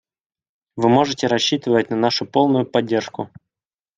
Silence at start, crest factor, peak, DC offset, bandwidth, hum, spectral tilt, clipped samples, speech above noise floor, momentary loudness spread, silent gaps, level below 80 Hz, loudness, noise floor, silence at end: 0.75 s; 18 dB; -2 dBFS; under 0.1%; 9.2 kHz; none; -5 dB/octave; under 0.1%; over 72 dB; 14 LU; none; -62 dBFS; -18 LUFS; under -90 dBFS; 0.7 s